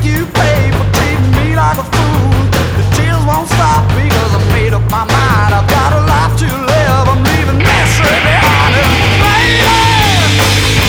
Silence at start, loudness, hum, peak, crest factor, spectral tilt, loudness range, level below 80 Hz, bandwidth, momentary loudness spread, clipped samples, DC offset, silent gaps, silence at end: 0 s; -10 LUFS; none; 0 dBFS; 10 dB; -5 dB/octave; 3 LU; -20 dBFS; 18.5 kHz; 4 LU; under 0.1%; under 0.1%; none; 0 s